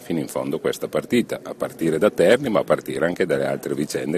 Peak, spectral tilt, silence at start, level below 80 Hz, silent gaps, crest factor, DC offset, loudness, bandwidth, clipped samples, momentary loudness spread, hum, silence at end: -2 dBFS; -5.5 dB/octave; 0 s; -58 dBFS; none; 20 dB; under 0.1%; -22 LUFS; 14 kHz; under 0.1%; 9 LU; none; 0 s